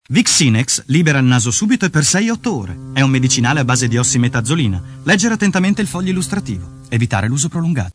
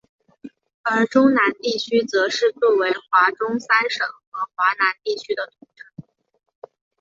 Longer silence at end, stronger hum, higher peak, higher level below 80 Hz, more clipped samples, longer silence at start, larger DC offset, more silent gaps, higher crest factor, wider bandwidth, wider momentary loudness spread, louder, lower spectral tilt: second, 0.05 s vs 1 s; neither; about the same, 0 dBFS vs -2 dBFS; first, -44 dBFS vs -70 dBFS; neither; second, 0.1 s vs 0.45 s; neither; second, none vs 0.74-0.84 s, 4.27-4.32 s; about the same, 14 dB vs 18 dB; first, 11 kHz vs 7.8 kHz; about the same, 9 LU vs 11 LU; first, -15 LUFS vs -20 LUFS; about the same, -4 dB/octave vs -3.5 dB/octave